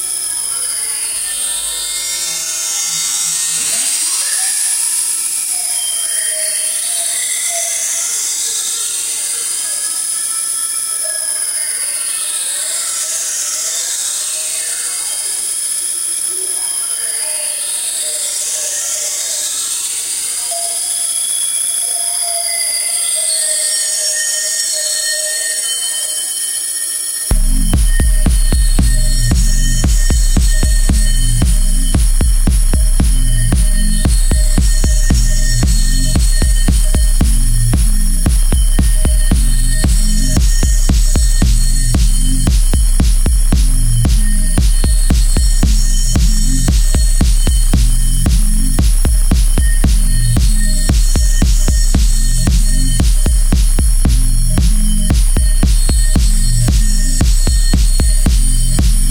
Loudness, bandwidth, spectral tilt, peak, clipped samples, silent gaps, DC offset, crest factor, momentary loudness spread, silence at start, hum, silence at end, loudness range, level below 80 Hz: -14 LUFS; 16 kHz; -3 dB/octave; 0 dBFS; under 0.1%; none; under 0.1%; 12 dB; 2 LU; 0 s; none; 0 s; 2 LU; -12 dBFS